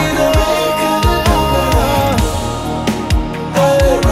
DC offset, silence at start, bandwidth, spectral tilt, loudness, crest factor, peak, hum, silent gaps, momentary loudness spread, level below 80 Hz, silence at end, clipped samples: under 0.1%; 0 s; 16.5 kHz; -5 dB/octave; -14 LUFS; 12 dB; 0 dBFS; none; none; 6 LU; -20 dBFS; 0 s; under 0.1%